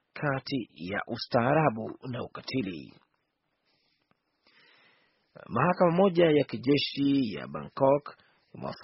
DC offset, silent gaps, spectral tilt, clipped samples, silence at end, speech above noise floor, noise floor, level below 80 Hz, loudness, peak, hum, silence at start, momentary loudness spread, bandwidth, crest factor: under 0.1%; none; -5 dB/octave; under 0.1%; 0 s; 51 dB; -78 dBFS; -66 dBFS; -28 LUFS; -8 dBFS; none; 0.15 s; 15 LU; 5.8 kHz; 20 dB